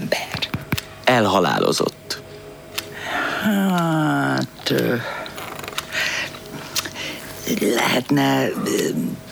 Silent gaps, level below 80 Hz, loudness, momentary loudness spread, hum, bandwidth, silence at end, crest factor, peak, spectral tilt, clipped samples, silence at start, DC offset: none; -52 dBFS; -21 LUFS; 12 LU; none; over 20 kHz; 0 s; 18 dB; -4 dBFS; -4.5 dB/octave; under 0.1%; 0 s; under 0.1%